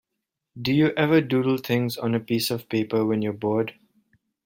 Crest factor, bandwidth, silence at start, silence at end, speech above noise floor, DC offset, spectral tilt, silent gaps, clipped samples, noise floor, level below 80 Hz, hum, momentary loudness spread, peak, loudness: 18 dB; 16.5 kHz; 0.55 s; 0.75 s; 60 dB; under 0.1%; -6 dB/octave; none; under 0.1%; -83 dBFS; -62 dBFS; none; 6 LU; -6 dBFS; -24 LUFS